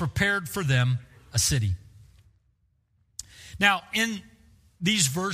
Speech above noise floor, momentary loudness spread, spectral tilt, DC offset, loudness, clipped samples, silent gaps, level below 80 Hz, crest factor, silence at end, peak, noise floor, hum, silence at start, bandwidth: 44 dB; 19 LU; -3.5 dB/octave; under 0.1%; -25 LUFS; under 0.1%; none; -48 dBFS; 22 dB; 0 s; -6 dBFS; -69 dBFS; none; 0 s; 15.5 kHz